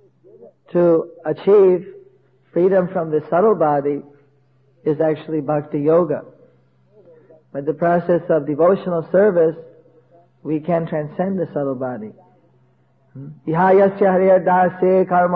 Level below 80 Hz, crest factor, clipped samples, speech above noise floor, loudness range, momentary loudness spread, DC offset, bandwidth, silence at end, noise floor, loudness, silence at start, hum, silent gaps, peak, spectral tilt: -62 dBFS; 14 dB; under 0.1%; 41 dB; 6 LU; 13 LU; under 0.1%; 4.6 kHz; 0 s; -58 dBFS; -18 LUFS; 0.4 s; none; none; -4 dBFS; -11 dB/octave